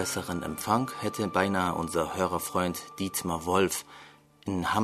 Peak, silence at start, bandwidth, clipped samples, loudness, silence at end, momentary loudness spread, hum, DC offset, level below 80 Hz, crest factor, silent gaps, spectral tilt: -8 dBFS; 0 s; 13.5 kHz; under 0.1%; -29 LUFS; 0 s; 8 LU; none; under 0.1%; -56 dBFS; 22 dB; none; -4.5 dB/octave